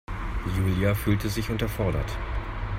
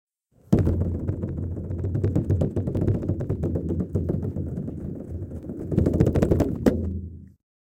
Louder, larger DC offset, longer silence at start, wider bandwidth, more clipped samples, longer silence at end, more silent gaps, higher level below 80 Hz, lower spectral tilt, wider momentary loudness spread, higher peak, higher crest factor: about the same, -28 LUFS vs -26 LUFS; neither; second, 0.1 s vs 0.5 s; first, 16 kHz vs 9 kHz; neither; second, 0 s vs 0.5 s; neither; about the same, -34 dBFS vs -36 dBFS; second, -6.5 dB/octave vs -9.5 dB/octave; second, 9 LU vs 13 LU; second, -10 dBFS vs -4 dBFS; second, 16 dB vs 22 dB